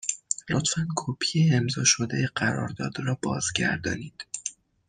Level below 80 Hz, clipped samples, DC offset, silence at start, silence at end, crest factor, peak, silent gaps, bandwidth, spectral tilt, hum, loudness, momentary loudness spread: -60 dBFS; under 0.1%; under 0.1%; 0 s; 0.35 s; 20 dB; -6 dBFS; none; 10.5 kHz; -3.5 dB/octave; none; -26 LUFS; 12 LU